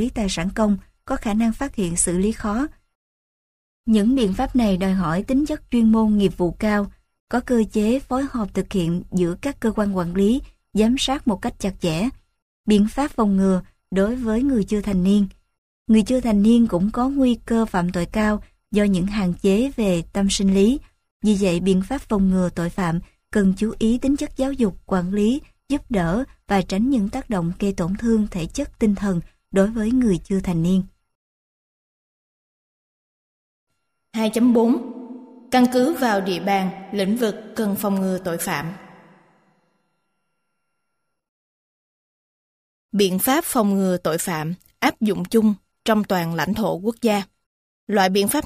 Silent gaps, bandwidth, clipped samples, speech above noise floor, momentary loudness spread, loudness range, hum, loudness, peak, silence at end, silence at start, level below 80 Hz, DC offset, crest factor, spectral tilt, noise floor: 2.95-3.84 s, 7.20-7.27 s, 12.42-12.64 s, 15.58-15.85 s, 21.11-21.20 s, 31.15-33.67 s, 41.29-42.89 s, 47.46-47.87 s; 15.5 kHz; under 0.1%; 58 dB; 8 LU; 5 LU; none; -21 LUFS; -4 dBFS; 0 s; 0 s; -40 dBFS; under 0.1%; 18 dB; -5.5 dB/octave; -78 dBFS